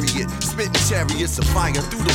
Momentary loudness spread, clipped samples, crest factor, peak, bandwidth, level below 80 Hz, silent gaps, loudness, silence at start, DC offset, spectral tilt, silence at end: 4 LU; under 0.1%; 16 dB; -4 dBFS; 17.5 kHz; -28 dBFS; none; -20 LUFS; 0 s; under 0.1%; -3.5 dB/octave; 0 s